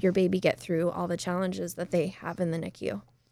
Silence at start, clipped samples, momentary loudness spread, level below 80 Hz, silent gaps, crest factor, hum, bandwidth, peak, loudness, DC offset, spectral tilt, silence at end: 0 s; under 0.1%; 9 LU; -62 dBFS; none; 18 dB; none; 15.5 kHz; -10 dBFS; -30 LUFS; under 0.1%; -6.5 dB/octave; 0.3 s